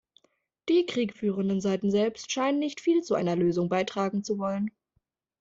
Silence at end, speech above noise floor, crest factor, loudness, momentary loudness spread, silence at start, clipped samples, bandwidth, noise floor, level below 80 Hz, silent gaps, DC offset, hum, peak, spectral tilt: 0.7 s; 49 dB; 14 dB; -28 LUFS; 5 LU; 0.65 s; under 0.1%; 7.8 kHz; -76 dBFS; -68 dBFS; none; under 0.1%; none; -14 dBFS; -6 dB/octave